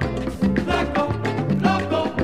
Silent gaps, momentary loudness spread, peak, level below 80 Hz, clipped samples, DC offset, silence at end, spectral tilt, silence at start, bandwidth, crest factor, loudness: none; 3 LU; -4 dBFS; -36 dBFS; under 0.1%; 0.6%; 0 s; -7 dB/octave; 0 s; 12.5 kHz; 16 dB; -22 LUFS